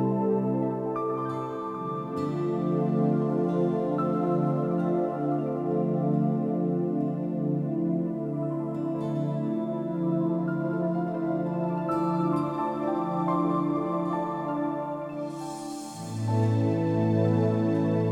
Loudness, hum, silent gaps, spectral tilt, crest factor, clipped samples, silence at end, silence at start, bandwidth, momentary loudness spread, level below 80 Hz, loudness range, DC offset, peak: -28 LUFS; none; none; -9 dB/octave; 16 dB; under 0.1%; 0 s; 0 s; 11 kHz; 7 LU; -68 dBFS; 3 LU; under 0.1%; -12 dBFS